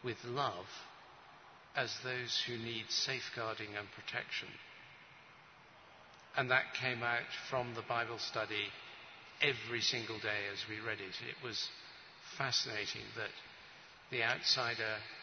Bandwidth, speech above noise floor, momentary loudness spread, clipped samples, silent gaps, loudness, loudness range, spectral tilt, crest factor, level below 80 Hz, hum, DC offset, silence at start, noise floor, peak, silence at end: 6.4 kHz; 21 dB; 22 LU; under 0.1%; none; -38 LUFS; 3 LU; -1 dB/octave; 26 dB; -78 dBFS; none; under 0.1%; 0 s; -60 dBFS; -16 dBFS; 0 s